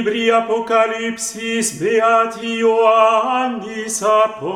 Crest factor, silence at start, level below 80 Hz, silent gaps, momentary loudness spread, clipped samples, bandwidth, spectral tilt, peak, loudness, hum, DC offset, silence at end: 16 dB; 0 s; -62 dBFS; none; 9 LU; under 0.1%; 16 kHz; -3 dB/octave; 0 dBFS; -16 LUFS; none; under 0.1%; 0 s